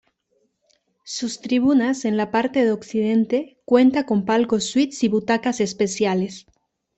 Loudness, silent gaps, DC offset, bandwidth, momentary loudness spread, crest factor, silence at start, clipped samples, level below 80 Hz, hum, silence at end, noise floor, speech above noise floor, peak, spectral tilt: -20 LUFS; none; under 0.1%; 8.4 kHz; 9 LU; 18 dB; 1.05 s; under 0.1%; -62 dBFS; none; 0.6 s; -68 dBFS; 48 dB; -4 dBFS; -5 dB/octave